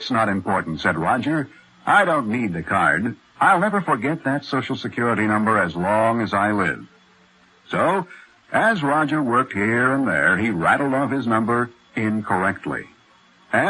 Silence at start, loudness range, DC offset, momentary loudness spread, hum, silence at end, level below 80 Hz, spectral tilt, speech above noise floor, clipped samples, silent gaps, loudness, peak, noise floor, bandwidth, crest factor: 0 s; 3 LU; under 0.1%; 8 LU; none; 0 s; -52 dBFS; -6 dB/octave; 35 dB; under 0.1%; none; -20 LUFS; -4 dBFS; -55 dBFS; 11.5 kHz; 18 dB